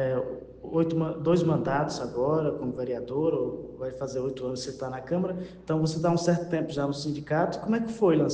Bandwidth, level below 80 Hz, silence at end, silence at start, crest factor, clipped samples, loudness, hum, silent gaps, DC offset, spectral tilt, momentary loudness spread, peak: 9.4 kHz; -56 dBFS; 0 s; 0 s; 16 dB; under 0.1%; -28 LUFS; none; none; under 0.1%; -7 dB/octave; 9 LU; -10 dBFS